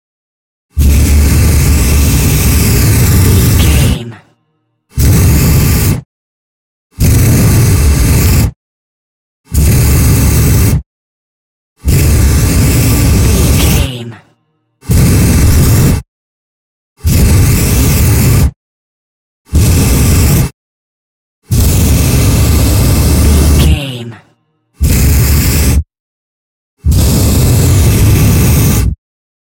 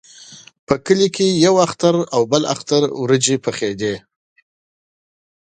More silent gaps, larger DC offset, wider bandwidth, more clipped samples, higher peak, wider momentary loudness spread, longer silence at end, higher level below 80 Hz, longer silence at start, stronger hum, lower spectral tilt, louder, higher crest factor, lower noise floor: first, 6.05-6.90 s, 8.56-9.44 s, 10.86-11.76 s, 16.08-16.96 s, 18.56-19.45 s, 20.54-21.42 s, 26.00-26.77 s vs 0.59-0.67 s; neither; first, 17 kHz vs 9.6 kHz; neither; about the same, 0 dBFS vs 0 dBFS; about the same, 8 LU vs 8 LU; second, 0.65 s vs 1.6 s; first, -14 dBFS vs -56 dBFS; first, 0.75 s vs 0.2 s; neither; about the same, -5 dB/octave vs -4.5 dB/octave; first, -9 LUFS vs -17 LUFS; second, 8 dB vs 18 dB; first, -61 dBFS vs -42 dBFS